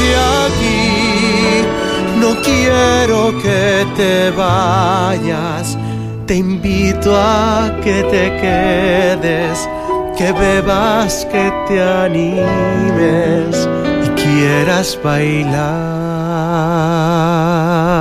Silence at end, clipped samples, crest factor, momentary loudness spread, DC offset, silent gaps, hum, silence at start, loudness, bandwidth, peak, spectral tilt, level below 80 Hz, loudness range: 0 s; under 0.1%; 12 dB; 6 LU; under 0.1%; none; none; 0 s; -13 LUFS; 15.5 kHz; -2 dBFS; -5.5 dB/octave; -30 dBFS; 2 LU